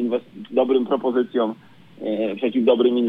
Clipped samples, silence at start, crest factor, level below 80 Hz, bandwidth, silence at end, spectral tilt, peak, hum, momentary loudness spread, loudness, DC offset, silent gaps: under 0.1%; 0 s; 16 dB; -74 dBFS; 4.2 kHz; 0 s; -8 dB/octave; -4 dBFS; none; 10 LU; -21 LUFS; under 0.1%; none